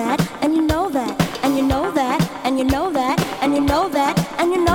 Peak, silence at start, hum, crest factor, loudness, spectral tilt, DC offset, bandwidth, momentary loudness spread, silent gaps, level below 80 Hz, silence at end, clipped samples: -2 dBFS; 0 s; none; 16 dB; -19 LUFS; -5.5 dB/octave; under 0.1%; 18.5 kHz; 3 LU; none; -36 dBFS; 0 s; under 0.1%